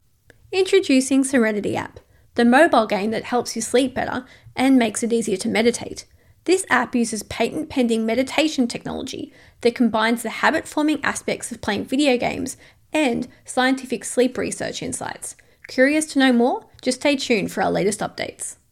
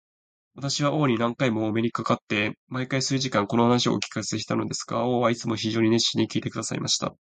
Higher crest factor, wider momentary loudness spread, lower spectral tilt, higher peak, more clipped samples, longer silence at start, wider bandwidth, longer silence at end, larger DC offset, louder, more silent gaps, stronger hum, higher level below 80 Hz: about the same, 20 dB vs 20 dB; first, 12 LU vs 7 LU; about the same, -3.5 dB/octave vs -4.5 dB/octave; first, -2 dBFS vs -6 dBFS; neither; about the same, 0.5 s vs 0.55 s; first, 15 kHz vs 9.4 kHz; about the same, 0.2 s vs 0.15 s; neither; first, -21 LUFS vs -25 LUFS; second, none vs 2.22-2.27 s, 2.57-2.67 s; neither; first, -56 dBFS vs -62 dBFS